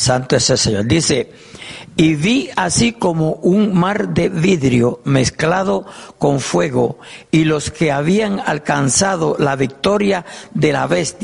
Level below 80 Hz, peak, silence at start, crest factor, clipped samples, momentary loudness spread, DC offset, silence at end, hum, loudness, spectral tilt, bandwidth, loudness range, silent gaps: -42 dBFS; -2 dBFS; 0 s; 14 dB; under 0.1%; 6 LU; under 0.1%; 0 s; none; -16 LUFS; -4.5 dB/octave; 11.5 kHz; 2 LU; none